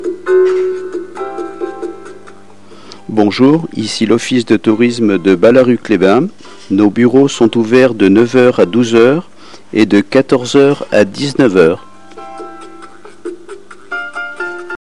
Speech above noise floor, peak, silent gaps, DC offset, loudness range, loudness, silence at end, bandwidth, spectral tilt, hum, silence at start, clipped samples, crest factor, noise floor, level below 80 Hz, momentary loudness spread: 29 dB; 0 dBFS; none; 2%; 7 LU; -11 LUFS; 0.05 s; 11 kHz; -6 dB/octave; 50 Hz at -45 dBFS; 0 s; 0.6%; 12 dB; -39 dBFS; -52 dBFS; 18 LU